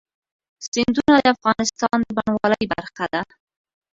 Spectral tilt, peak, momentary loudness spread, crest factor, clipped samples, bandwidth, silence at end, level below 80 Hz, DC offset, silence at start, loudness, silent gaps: -4 dB/octave; 0 dBFS; 11 LU; 20 dB; under 0.1%; 7.8 kHz; 0.7 s; -52 dBFS; under 0.1%; 0.6 s; -20 LUFS; 0.68-0.72 s